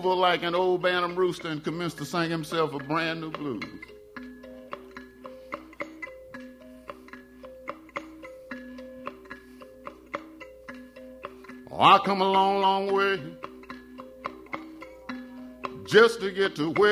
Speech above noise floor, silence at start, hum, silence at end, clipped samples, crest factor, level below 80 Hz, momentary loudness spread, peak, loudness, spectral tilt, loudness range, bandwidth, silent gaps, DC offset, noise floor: 24 dB; 0 s; none; 0 s; under 0.1%; 24 dB; -62 dBFS; 23 LU; -4 dBFS; -25 LUFS; -5 dB/octave; 18 LU; 15.5 kHz; none; under 0.1%; -48 dBFS